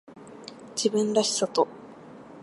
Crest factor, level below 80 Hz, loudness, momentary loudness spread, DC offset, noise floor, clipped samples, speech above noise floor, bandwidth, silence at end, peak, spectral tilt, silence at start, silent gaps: 20 dB; -74 dBFS; -26 LUFS; 23 LU; under 0.1%; -46 dBFS; under 0.1%; 21 dB; 11.5 kHz; 0 s; -8 dBFS; -3.5 dB/octave; 0.1 s; none